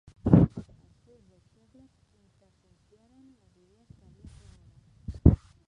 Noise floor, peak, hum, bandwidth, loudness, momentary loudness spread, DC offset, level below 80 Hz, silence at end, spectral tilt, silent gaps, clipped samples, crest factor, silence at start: -66 dBFS; -4 dBFS; none; 5.6 kHz; -23 LUFS; 24 LU; under 0.1%; -38 dBFS; 0.35 s; -11.5 dB/octave; none; under 0.1%; 26 dB; 0.25 s